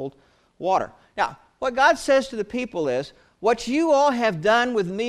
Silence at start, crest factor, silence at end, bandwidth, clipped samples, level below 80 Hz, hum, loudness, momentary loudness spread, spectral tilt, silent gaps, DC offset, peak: 0 s; 18 dB; 0 s; 13 kHz; under 0.1%; -56 dBFS; none; -22 LUFS; 11 LU; -4.5 dB/octave; none; under 0.1%; -4 dBFS